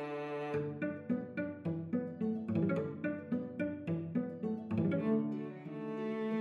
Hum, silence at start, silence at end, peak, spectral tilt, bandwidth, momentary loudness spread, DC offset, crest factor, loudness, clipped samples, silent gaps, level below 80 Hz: none; 0 s; 0 s; -22 dBFS; -10 dB/octave; 5 kHz; 6 LU; under 0.1%; 14 dB; -38 LUFS; under 0.1%; none; -74 dBFS